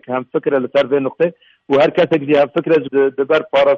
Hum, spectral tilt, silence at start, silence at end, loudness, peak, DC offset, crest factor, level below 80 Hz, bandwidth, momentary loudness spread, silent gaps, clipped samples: none; -7 dB/octave; 0.1 s; 0 s; -16 LUFS; -4 dBFS; under 0.1%; 12 dB; -58 dBFS; 7 kHz; 6 LU; none; under 0.1%